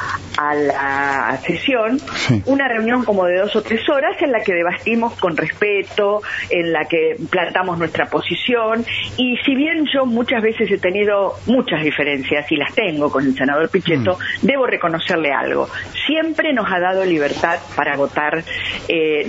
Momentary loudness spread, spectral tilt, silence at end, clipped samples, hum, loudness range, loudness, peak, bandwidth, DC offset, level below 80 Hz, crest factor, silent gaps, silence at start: 3 LU; -5.5 dB/octave; 0 s; under 0.1%; none; 1 LU; -17 LUFS; 0 dBFS; 8 kHz; under 0.1%; -50 dBFS; 18 dB; none; 0 s